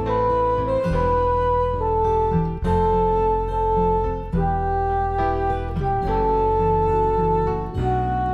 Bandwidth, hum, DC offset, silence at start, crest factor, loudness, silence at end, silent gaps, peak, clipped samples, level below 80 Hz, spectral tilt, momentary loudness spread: 6.8 kHz; none; under 0.1%; 0 s; 12 dB; -21 LUFS; 0 s; none; -8 dBFS; under 0.1%; -28 dBFS; -9 dB/octave; 4 LU